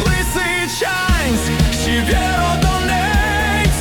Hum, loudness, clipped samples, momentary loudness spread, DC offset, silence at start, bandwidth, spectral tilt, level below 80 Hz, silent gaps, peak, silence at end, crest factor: none; -16 LUFS; under 0.1%; 2 LU; under 0.1%; 0 s; 18 kHz; -4 dB/octave; -22 dBFS; none; -2 dBFS; 0 s; 14 dB